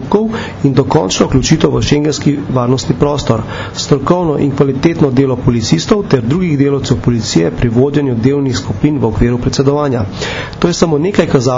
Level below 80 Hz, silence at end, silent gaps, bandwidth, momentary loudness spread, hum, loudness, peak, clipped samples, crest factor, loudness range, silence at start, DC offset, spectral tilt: -30 dBFS; 0 s; none; 7.6 kHz; 4 LU; none; -12 LUFS; 0 dBFS; 0.3%; 12 dB; 1 LU; 0 s; under 0.1%; -6 dB/octave